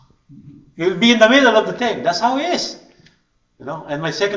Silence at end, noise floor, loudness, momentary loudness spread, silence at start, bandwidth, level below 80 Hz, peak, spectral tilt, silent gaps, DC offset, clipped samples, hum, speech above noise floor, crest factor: 0 s; -61 dBFS; -16 LUFS; 17 LU; 0.35 s; 7.6 kHz; -58 dBFS; 0 dBFS; -4 dB/octave; none; under 0.1%; under 0.1%; none; 45 dB; 18 dB